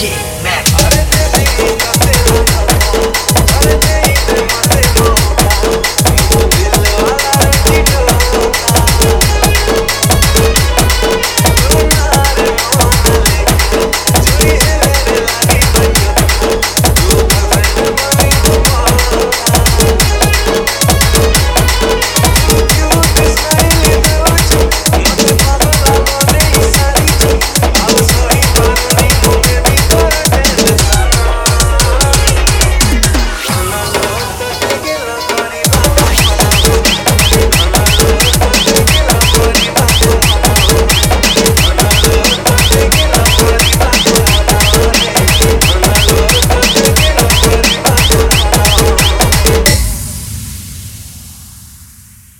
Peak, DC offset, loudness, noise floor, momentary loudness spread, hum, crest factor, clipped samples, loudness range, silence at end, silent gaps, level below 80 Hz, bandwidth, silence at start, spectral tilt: 0 dBFS; under 0.1%; -9 LUFS; -37 dBFS; 3 LU; none; 8 dB; 0.4%; 2 LU; 0.55 s; none; -14 dBFS; over 20 kHz; 0 s; -3.5 dB/octave